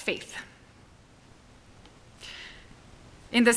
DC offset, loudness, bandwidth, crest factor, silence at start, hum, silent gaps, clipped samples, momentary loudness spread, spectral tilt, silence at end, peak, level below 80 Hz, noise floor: under 0.1%; -32 LUFS; 11 kHz; 22 dB; 0 s; none; none; under 0.1%; 25 LU; -3 dB/octave; 0 s; -8 dBFS; -58 dBFS; -55 dBFS